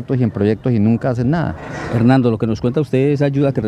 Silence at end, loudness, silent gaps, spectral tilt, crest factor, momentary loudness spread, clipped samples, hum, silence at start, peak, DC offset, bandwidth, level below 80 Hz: 0 s; -16 LUFS; none; -9 dB/octave; 14 dB; 6 LU; under 0.1%; none; 0 s; -2 dBFS; under 0.1%; 9 kHz; -42 dBFS